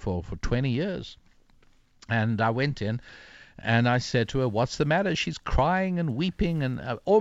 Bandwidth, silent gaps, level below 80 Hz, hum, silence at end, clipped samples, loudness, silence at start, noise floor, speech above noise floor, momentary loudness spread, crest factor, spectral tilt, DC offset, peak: 8 kHz; none; -40 dBFS; none; 0 s; under 0.1%; -27 LUFS; 0 s; -59 dBFS; 33 dB; 9 LU; 16 dB; -6.5 dB/octave; under 0.1%; -10 dBFS